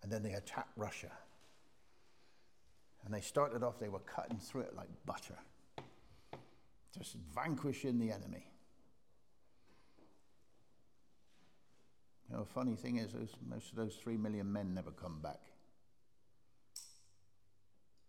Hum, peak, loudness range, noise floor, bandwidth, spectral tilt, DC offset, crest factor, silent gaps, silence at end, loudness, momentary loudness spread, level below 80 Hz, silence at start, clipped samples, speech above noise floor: none; -22 dBFS; 7 LU; -80 dBFS; 16.5 kHz; -6 dB/octave; under 0.1%; 24 dB; none; 1.15 s; -44 LUFS; 18 LU; -74 dBFS; 0 s; under 0.1%; 37 dB